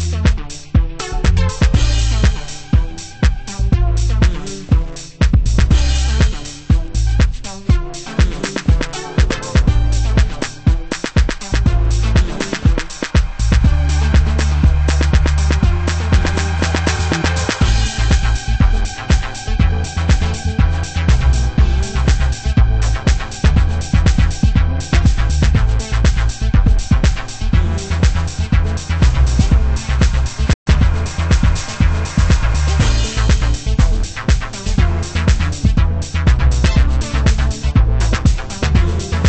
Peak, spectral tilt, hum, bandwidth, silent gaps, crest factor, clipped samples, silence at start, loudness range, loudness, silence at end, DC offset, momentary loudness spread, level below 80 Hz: 0 dBFS; -5.5 dB/octave; none; 8.6 kHz; 30.54-30.66 s; 14 dB; under 0.1%; 0 s; 2 LU; -16 LUFS; 0 s; under 0.1%; 4 LU; -16 dBFS